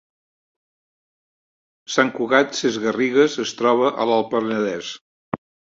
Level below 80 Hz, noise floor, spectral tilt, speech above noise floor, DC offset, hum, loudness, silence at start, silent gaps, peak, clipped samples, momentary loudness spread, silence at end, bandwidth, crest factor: -66 dBFS; under -90 dBFS; -4 dB/octave; over 71 dB; under 0.1%; none; -20 LUFS; 1.9 s; 5.01-5.32 s; -2 dBFS; under 0.1%; 15 LU; 0.4 s; 7.8 kHz; 20 dB